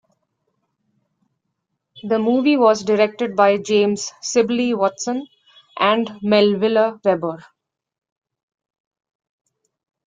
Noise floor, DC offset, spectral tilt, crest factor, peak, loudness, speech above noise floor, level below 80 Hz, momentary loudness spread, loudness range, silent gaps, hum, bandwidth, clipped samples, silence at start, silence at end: -76 dBFS; under 0.1%; -4.5 dB/octave; 18 dB; -2 dBFS; -18 LUFS; 59 dB; -66 dBFS; 10 LU; 4 LU; none; none; 9.4 kHz; under 0.1%; 1.95 s; 2.65 s